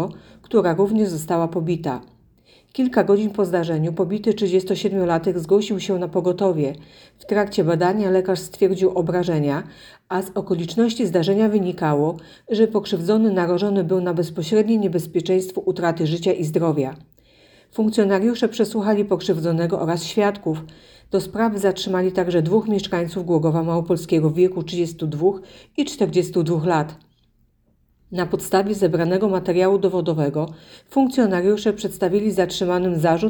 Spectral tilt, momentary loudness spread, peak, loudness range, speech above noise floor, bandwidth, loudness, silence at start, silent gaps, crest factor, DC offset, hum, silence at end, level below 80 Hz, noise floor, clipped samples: -6.5 dB/octave; 7 LU; -4 dBFS; 2 LU; 42 dB; 19.5 kHz; -20 LUFS; 0 s; none; 16 dB; under 0.1%; none; 0 s; -56 dBFS; -62 dBFS; under 0.1%